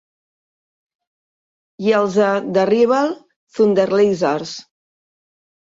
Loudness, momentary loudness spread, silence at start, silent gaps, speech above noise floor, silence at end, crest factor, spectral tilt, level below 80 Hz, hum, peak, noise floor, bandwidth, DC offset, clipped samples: -17 LUFS; 16 LU; 1.8 s; 3.36-3.47 s; over 74 dB; 1.05 s; 16 dB; -6 dB/octave; -64 dBFS; none; -4 dBFS; under -90 dBFS; 7.8 kHz; under 0.1%; under 0.1%